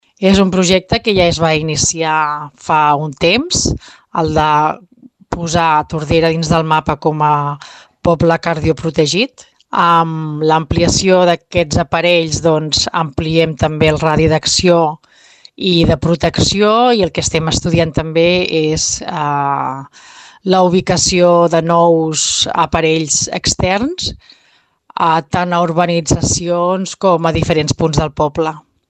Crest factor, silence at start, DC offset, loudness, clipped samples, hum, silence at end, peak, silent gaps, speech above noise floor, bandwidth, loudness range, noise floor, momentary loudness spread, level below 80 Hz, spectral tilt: 14 dB; 0.2 s; under 0.1%; -13 LUFS; under 0.1%; none; 0.3 s; 0 dBFS; none; 41 dB; 9.4 kHz; 3 LU; -54 dBFS; 7 LU; -34 dBFS; -4 dB/octave